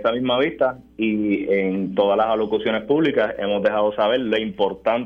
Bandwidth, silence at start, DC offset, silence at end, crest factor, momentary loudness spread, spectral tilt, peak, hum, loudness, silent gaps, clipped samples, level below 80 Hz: 6 kHz; 0 s; under 0.1%; 0 s; 14 dB; 4 LU; -7.5 dB/octave; -6 dBFS; none; -21 LUFS; none; under 0.1%; -54 dBFS